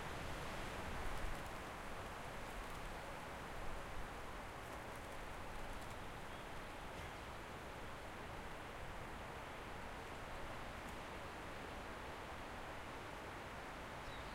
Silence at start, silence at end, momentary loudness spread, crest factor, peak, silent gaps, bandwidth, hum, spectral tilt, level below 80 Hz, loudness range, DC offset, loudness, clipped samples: 0 s; 0 s; 4 LU; 16 dB; -32 dBFS; none; 16 kHz; none; -4.5 dB/octave; -56 dBFS; 2 LU; under 0.1%; -50 LUFS; under 0.1%